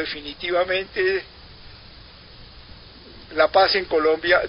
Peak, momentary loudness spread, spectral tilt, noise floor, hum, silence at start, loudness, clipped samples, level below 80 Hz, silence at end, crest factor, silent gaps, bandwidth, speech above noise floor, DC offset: -4 dBFS; 13 LU; -7.5 dB/octave; -45 dBFS; none; 0 s; -21 LUFS; under 0.1%; -50 dBFS; 0 s; 20 dB; none; 5.6 kHz; 24 dB; under 0.1%